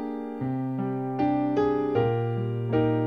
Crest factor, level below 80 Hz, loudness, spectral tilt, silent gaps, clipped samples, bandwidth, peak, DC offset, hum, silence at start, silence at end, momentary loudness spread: 14 dB; -56 dBFS; -27 LUFS; -10 dB/octave; none; under 0.1%; 6 kHz; -12 dBFS; 0.1%; none; 0 s; 0 s; 6 LU